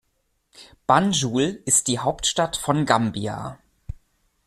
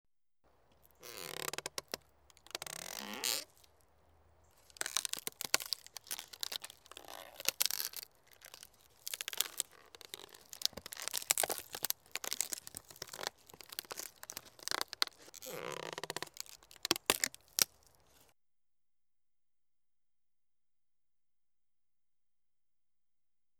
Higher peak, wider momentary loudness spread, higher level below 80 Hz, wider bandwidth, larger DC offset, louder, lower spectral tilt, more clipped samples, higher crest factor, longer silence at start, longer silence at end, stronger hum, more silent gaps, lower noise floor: first, -2 dBFS vs -8 dBFS; first, 21 LU vs 18 LU; first, -48 dBFS vs -76 dBFS; second, 14.5 kHz vs over 20 kHz; neither; first, -21 LUFS vs -38 LUFS; first, -3.5 dB/octave vs 0.5 dB/octave; neither; second, 20 dB vs 36 dB; second, 0.6 s vs 1 s; second, 0.5 s vs 5.9 s; neither; neither; second, -71 dBFS vs under -90 dBFS